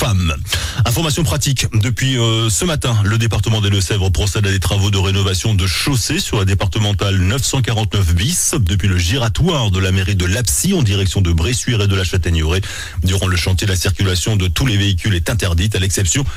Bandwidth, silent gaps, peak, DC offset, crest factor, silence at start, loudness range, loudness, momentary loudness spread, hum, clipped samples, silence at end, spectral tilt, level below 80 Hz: 16.5 kHz; none; -6 dBFS; under 0.1%; 10 dB; 0 s; 1 LU; -16 LUFS; 2 LU; none; under 0.1%; 0 s; -4 dB/octave; -26 dBFS